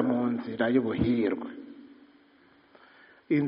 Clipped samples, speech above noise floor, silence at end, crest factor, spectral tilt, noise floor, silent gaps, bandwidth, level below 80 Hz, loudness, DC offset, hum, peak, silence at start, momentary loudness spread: under 0.1%; 33 dB; 0 s; 18 dB; -6.5 dB/octave; -60 dBFS; none; 5.2 kHz; -56 dBFS; -28 LUFS; under 0.1%; none; -12 dBFS; 0 s; 20 LU